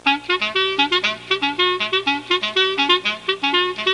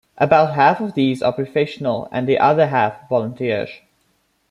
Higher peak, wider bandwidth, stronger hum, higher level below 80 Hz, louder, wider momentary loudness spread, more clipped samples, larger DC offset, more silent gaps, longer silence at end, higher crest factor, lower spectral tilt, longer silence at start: about the same, -2 dBFS vs -2 dBFS; about the same, 11 kHz vs 11 kHz; first, 60 Hz at -50 dBFS vs none; about the same, -62 dBFS vs -60 dBFS; about the same, -18 LUFS vs -18 LUFS; second, 4 LU vs 8 LU; neither; neither; neither; second, 0 s vs 0.75 s; about the same, 18 dB vs 16 dB; second, -2.5 dB/octave vs -7.5 dB/octave; second, 0.05 s vs 0.2 s